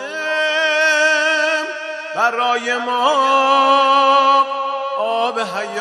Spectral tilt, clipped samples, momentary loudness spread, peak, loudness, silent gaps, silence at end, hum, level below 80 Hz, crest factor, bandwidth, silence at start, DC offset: -1 dB/octave; under 0.1%; 10 LU; 0 dBFS; -15 LUFS; none; 0 s; none; -80 dBFS; 16 dB; 12.5 kHz; 0 s; under 0.1%